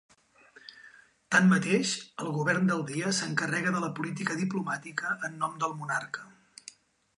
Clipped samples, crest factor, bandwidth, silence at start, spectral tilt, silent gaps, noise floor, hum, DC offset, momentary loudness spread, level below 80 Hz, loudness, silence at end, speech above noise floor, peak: under 0.1%; 20 dB; 11 kHz; 0.7 s; -4.5 dB/octave; none; -59 dBFS; none; under 0.1%; 24 LU; -76 dBFS; -29 LUFS; 0.9 s; 29 dB; -10 dBFS